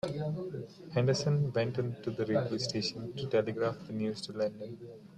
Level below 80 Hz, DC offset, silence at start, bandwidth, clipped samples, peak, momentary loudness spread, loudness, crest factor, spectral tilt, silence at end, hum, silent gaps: -68 dBFS; under 0.1%; 0.05 s; 10.5 kHz; under 0.1%; -16 dBFS; 10 LU; -33 LUFS; 18 dB; -6 dB/octave; 0 s; none; none